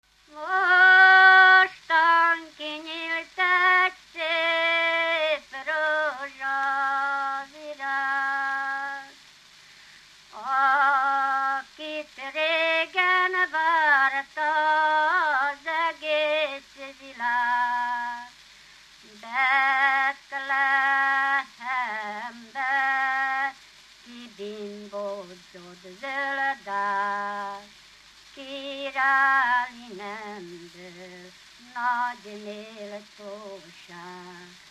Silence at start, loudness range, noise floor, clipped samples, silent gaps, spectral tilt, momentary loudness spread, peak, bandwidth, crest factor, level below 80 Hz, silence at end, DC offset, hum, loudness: 0.35 s; 10 LU; -52 dBFS; under 0.1%; none; -2 dB/octave; 20 LU; -6 dBFS; 13.5 kHz; 18 dB; -72 dBFS; 0.2 s; under 0.1%; 50 Hz at -70 dBFS; -22 LUFS